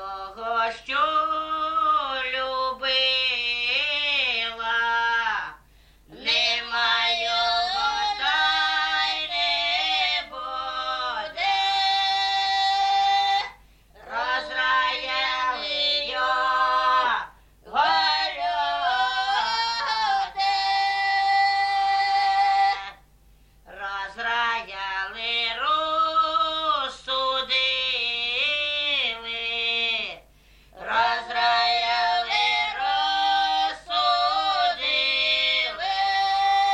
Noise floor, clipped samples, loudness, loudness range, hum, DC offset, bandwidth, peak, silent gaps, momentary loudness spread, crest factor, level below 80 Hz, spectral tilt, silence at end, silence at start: -55 dBFS; under 0.1%; -22 LUFS; 2 LU; none; under 0.1%; 10.5 kHz; -10 dBFS; none; 7 LU; 14 dB; -56 dBFS; -0.5 dB/octave; 0 s; 0 s